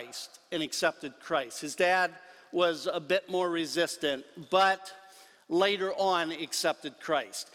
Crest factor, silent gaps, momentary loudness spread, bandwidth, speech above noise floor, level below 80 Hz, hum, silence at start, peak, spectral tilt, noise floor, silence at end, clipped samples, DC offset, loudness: 18 dB; none; 11 LU; 16.5 kHz; 25 dB; -74 dBFS; none; 0 s; -12 dBFS; -2.5 dB/octave; -55 dBFS; 0.1 s; under 0.1%; under 0.1%; -30 LUFS